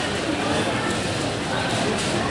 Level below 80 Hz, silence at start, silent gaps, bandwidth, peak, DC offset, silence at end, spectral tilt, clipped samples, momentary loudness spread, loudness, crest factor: -46 dBFS; 0 s; none; 11.5 kHz; -10 dBFS; under 0.1%; 0 s; -4 dB/octave; under 0.1%; 2 LU; -23 LUFS; 14 dB